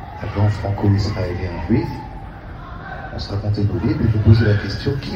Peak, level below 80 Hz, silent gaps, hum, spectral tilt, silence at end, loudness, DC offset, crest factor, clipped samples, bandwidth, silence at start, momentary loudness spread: 0 dBFS; -32 dBFS; none; none; -8 dB/octave; 0 s; -19 LUFS; under 0.1%; 18 dB; under 0.1%; 7 kHz; 0 s; 19 LU